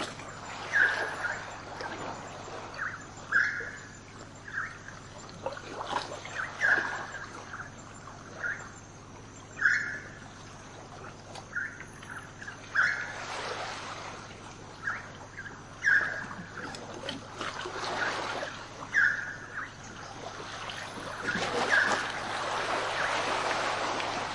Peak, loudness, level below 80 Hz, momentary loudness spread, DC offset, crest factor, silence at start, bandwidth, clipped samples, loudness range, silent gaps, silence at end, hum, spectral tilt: -12 dBFS; -32 LUFS; -60 dBFS; 19 LU; under 0.1%; 22 dB; 0 s; 11.5 kHz; under 0.1%; 4 LU; none; 0 s; 50 Hz at -70 dBFS; -2.5 dB/octave